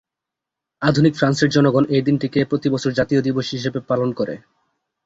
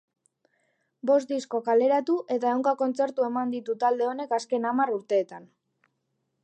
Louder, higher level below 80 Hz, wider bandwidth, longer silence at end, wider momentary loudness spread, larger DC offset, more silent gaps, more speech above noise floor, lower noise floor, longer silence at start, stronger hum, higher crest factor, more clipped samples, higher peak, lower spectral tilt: first, -19 LUFS vs -26 LUFS; first, -54 dBFS vs -86 dBFS; second, 8 kHz vs 9 kHz; second, 0.7 s vs 1 s; about the same, 8 LU vs 6 LU; neither; neither; first, 67 dB vs 52 dB; first, -85 dBFS vs -77 dBFS; second, 0.8 s vs 1.05 s; neither; about the same, 16 dB vs 16 dB; neither; first, -2 dBFS vs -12 dBFS; first, -6.5 dB/octave vs -5 dB/octave